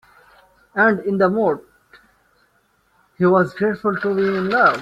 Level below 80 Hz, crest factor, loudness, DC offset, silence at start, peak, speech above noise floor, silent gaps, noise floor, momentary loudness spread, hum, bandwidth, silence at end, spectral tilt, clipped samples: -60 dBFS; 18 dB; -18 LUFS; under 0.1%; 0.75 s; -2 dBFS; 45 dB; none; -62 dBFS; 6 LU; none; 7.8 kHz; 0 s; -8 dB/octave; under 0.1%